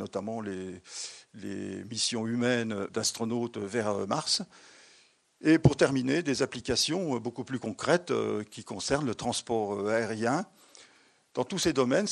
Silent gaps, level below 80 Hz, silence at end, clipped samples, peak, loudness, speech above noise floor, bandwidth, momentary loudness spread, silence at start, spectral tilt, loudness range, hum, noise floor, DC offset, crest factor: none; -56 dBFS; 0 s; under 0.1%; -6 dBFS; -30 LUFS; 33 dB; 12 kHz; 13 LU; 0 s; -4.5 dB/octave; 4 LU; none; -63 dBFS; under 0.1%; 24 dB